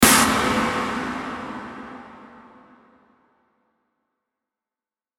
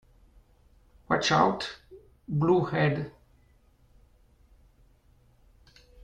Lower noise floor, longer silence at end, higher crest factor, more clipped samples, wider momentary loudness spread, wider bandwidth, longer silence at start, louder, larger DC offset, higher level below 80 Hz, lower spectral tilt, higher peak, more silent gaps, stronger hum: first, under -90 dBFS vs -62 dBFS; second, 2.75 s vs 2.95 s; about the same, 24 dB vs 24 dB; neither; first, 23 LU vs 18 LU; first, 17 kHz vs 9.4 kHz; second, 0 s vs 1.1 s; first, -21 LUFS vs -26 LUFS; neither; first, -48 dBFS vs -58 dBFS; second, -2.5 dB/octave vs -5.5 dB/octave; first, -2 dBFS vs -8 dBFS; neither; neither